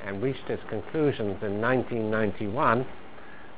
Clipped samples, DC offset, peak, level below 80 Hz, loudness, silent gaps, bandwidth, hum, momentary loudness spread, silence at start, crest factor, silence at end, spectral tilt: under 0.1%; 1%; -8 dBFS; -54 dBFS; -28 LUFS; none; 4 kHz; none; 14 LU; 0 s; 20 dB; 0 s; -5.5 dB/octave